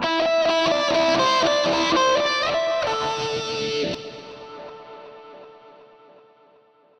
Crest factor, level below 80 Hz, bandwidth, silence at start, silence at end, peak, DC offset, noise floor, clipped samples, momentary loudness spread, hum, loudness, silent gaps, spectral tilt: 14 dB; -56 dBFS; 9.8 kHz; 0 s; 1.3 s; -10 dBFS; under 0.1%; -56 dBFS; under 0.1%; 21 LU; none; -21 LUFS; none; -3 dB/octave